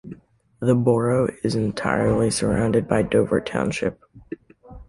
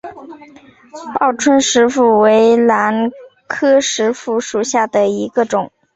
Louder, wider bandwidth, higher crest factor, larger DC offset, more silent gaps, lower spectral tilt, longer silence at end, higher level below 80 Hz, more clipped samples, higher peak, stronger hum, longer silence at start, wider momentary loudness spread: second, -21 LUFS vs -14 LUFS; first, 11.5 kHz vs 8.2 kHz; about the same, 18 dB vs 14 dB; neither; neither; first, -6 dB/octave vs -3.5 dB/octave; second, 0.05 s vs 0.3 s; first, -44 dBFS vs -58 dBFS; neither; about the same, -4 dBFS vs -2 dBFS; neither; about the same, 0.05 s vs 0.05 s; first, 20 LU vs 10 LU